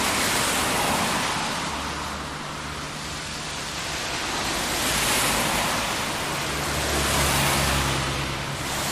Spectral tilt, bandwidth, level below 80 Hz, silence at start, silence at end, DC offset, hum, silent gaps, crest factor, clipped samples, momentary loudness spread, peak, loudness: -2.5 dB/octave; 15.5 kHz; -38 dBFS; 0 s; 0 s; under 0.1%; none; none; 16 dB; under 0.1%; 10 LU; -8 dBFS; -24 LUFS